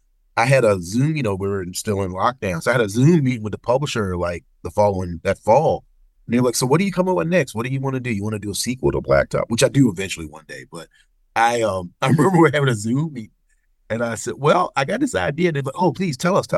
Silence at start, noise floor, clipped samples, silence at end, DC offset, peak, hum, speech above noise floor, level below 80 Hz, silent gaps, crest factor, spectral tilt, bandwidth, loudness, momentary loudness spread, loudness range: 0.35 s; -62 dBFS; under 0.1%; 0 s; under 0.1%; -4 dBFS; none; 43 dB; -46 dBFS; none; 16 dB; -5.5 dB/octave; 12.5 kHz; -20 LUFS; 11 LU; 2 LU